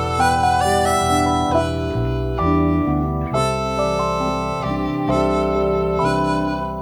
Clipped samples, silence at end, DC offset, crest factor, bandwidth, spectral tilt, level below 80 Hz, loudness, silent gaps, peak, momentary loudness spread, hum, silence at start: under 0.1%; 0 s; under 0.1%; 14 dB; 19 kHz; -6 dB/octave; -32 dBFS; -19 LUFS; none; -4 dBFS; 5 LU; none; 0 s